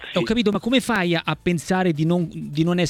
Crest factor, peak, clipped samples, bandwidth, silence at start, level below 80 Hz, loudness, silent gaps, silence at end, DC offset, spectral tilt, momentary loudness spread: 16 dB; -6 dBFS; under 0.1%; 14.5 kHz; 0 s; -48 dBFS; -21 LUFS; none; 0 s; under 0.1%; -6 dB/octave; 4 LU